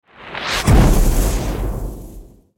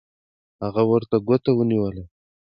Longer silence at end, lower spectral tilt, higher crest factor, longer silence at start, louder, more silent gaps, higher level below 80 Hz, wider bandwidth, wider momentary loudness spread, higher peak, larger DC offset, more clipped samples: about the same, 0.35 s vs 0.45 s; second, -5 dB/octave vs -11 dB/octave; about the same, 14 dB vs 16 dB; second, 0.2 s vs 0.6 s; first, -18 LUFS vs -21 LUFS; neither; first, -18 dBFS vs -52 dBFS; first, 17 kHz vs 5.4 kHz; first, 18 LU vs 11 LU; first, -2 dBFS vs -6 dBFS; neither; neither